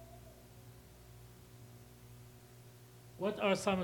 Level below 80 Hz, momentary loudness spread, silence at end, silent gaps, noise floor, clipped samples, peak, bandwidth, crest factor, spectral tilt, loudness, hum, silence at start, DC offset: -66 dBFS; 24 LU; 0 s; none; -57 dBFS; under 0.1%; -18 dBFS; 18 kHz; 24 dB; -5 dB/octave; -35 LUFS; 60 Hz at -60 dBFS; 0 s; under 0.1%